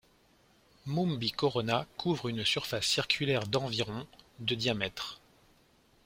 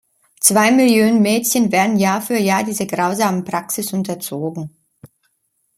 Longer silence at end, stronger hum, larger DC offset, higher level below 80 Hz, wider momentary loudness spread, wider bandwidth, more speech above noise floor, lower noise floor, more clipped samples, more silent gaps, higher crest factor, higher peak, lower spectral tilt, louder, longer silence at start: first, 0.9 s vs 0.7 s; neither; neither; about the same, -62 dBFS vs -62 dBFS; about the same, 12 LU vs 12 LU; about the same, 16.5 kHz vs 16.5 kHz; second, 33 dB vs 51 dB; about the same, -66 dBFS vs -67 dBFS; neither; neither; first, 24 dB vs 18 dB; second, -10 dBFS vs 0 dBFS; about the same, -4.5 dB/octave vs -4 dB/octave; second, -32 LUFS vs -16 LUFS; first, 0.85 s vs 0.4 s